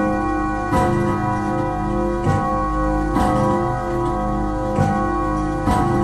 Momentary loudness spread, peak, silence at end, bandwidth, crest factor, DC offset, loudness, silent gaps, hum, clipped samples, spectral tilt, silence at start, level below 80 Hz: 4 LU; -4 dBFS; 0 s; 13 kHz; 14 dB; under 0.1%; -20 LUFS; none; 50 Hz at -30 dBFS; under 0.1%; -7.5 dB/octave; 0 s; -28 dBFS